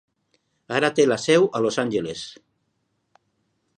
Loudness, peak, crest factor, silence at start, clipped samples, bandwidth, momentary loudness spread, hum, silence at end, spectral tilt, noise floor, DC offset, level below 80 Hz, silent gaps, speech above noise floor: -21 LUFS; -4 dBFS; 20 dB; 0.7 s; under 0.1%; 10.5 kHz; 14 LU; none; 1.45 s; -4.5 dB/octave; -73 dBFS; under 0.1%; -66 dBFS; none; 52 dB